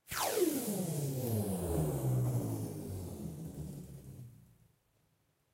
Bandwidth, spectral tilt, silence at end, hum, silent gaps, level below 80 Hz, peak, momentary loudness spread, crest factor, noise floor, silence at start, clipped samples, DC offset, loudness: 16 kHz; -5.5 dB/octave; 1.15 s; none; none; -56 dBFS; -20 dBFS; 17 LU; 18 dB; -76 dBFS; 0.1 s; under 0.1%; under 0.1%; -36 LUFS